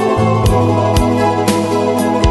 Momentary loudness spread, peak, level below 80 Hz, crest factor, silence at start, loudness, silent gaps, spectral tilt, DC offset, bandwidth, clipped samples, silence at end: 2 LU; 0 dBFS; -26 dBFS; 12 dB; 0 s; -13 LUFS; none; -6.5 dB/octave; under 0.1%; 12.5 kHz; under 0.1%; 0 s